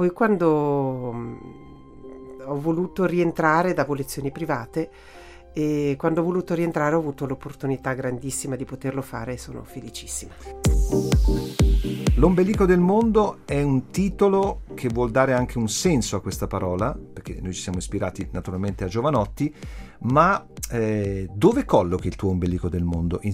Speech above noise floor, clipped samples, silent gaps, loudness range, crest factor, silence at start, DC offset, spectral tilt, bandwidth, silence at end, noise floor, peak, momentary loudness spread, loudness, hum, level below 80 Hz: 21 dB; under 0.1%; none; 7 LU; 20 dB; 0 s; under 0.1%; -6.5 dB/octave; 16 kHz; 0 s; -44 dBFS; -2 dBFS; 13 LU; -23 LUFS; none; -32 dBFS